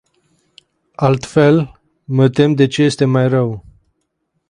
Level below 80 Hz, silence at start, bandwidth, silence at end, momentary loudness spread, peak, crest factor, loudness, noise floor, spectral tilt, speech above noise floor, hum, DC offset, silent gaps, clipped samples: -50 dBFS; 1 s; 10.5 kHz; 0.9 s; 9 LU; 0 dBFS; 16 dB; -14 LUFS; -69 dBFS; -7 dB/octave; 56 dB; none; under 0.1%; none; under 0.1%